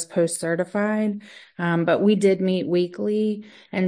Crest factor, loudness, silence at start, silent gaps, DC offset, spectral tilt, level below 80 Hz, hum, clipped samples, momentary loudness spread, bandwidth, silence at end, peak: 14 dB; -22 LUFS; 0 s; none; under 0.1%; -6 dB/octave; -70 dBFS; none; under 0.1%; 11 LU; 10.5 kHz; 0 s; -8 dBFS